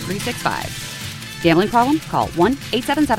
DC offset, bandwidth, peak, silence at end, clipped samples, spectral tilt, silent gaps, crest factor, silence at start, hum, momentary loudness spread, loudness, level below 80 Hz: under 0.1%; 16.5 kHz; -2 dBFS; 0 s; under 0.1%; -5 dB/octave; none; 16 dB; 0 s; none; 12 LU; -19 LUFS; -42 dBFS